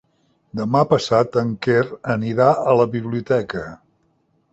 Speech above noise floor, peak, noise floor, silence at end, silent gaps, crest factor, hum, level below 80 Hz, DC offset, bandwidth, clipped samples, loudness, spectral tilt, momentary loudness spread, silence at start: 45 dB; -2 dBFS; -64 dBFS; 0.75 s; none; 18 dB; none; -54 dBFS; under 0.1%; 8.2 kHz; under 0.1%; -19 LUFS; -7 dB/octave; 12 LU; 0.55 s